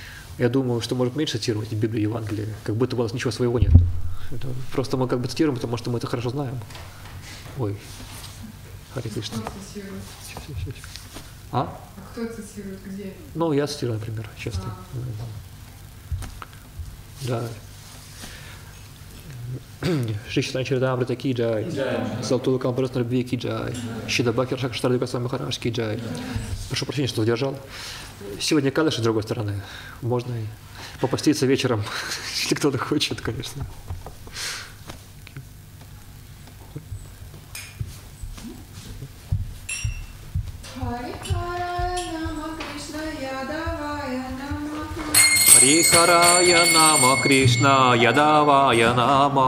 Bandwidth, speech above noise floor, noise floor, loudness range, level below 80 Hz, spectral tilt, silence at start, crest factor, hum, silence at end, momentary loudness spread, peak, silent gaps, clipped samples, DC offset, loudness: 16 kHz; 20 dB; -43 dBFS; 20 LU; -38 dBFS; -3.5 dB/octave; 0 s; 24 dB; none; 0 s; 23 LU; 0 dBFS; none; under 0.1%; under 0.1%; -21 LUFS